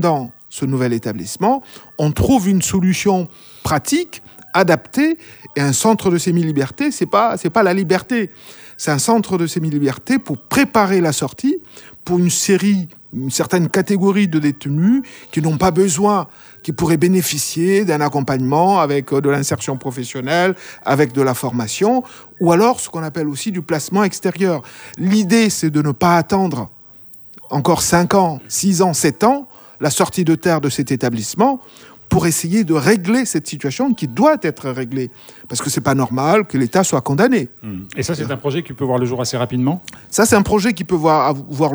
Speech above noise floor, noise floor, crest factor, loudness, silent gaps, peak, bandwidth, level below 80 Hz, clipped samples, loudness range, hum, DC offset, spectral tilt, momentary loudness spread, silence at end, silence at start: 24 dB; -40 dBFS; 16 dB; -17 LUFS; none; 0 dBFS; over 20 kHz; -46 dBFS; under 0.1%; 2 LU; none; under 0.1%; -5 dB/octave; 11 LU; 0 s; 0 s